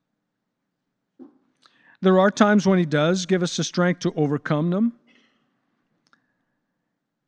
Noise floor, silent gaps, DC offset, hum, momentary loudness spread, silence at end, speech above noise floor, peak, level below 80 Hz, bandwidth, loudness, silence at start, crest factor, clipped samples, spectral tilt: -79 dBFS; none; under 0.1%; none; 7 LU; 2.35 s; 59 dB; -4 dBFS; -70 dBFS; 9.2 kHz; -21 LUFS; 1.2 s; 20 dB; under 0.1%; -6 dB/octave